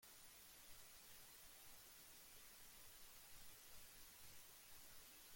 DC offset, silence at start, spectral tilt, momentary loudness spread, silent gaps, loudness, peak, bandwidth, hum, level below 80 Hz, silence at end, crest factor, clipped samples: under 0.1%; 0 s; -0.5 dB/octave; 0 LU; none; -61 LUFS; -48 dBFS; 17 kHz; none; -76 dBFS; 0 s; 14 dB; under 0.1%